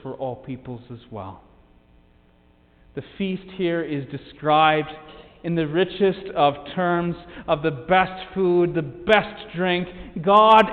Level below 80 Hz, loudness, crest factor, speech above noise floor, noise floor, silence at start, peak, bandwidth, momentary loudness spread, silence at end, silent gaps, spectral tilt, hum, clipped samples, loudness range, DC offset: -52 dBFS; -21 LUFS; 20 dB; 35 dB; -56 dBFS; 0.05 s; -2 dBFS; 7.2 kHz; 19 LU; 0 s; none; -7.5 dB/octave; none; under 0.1%; 11 LU; under 0.1%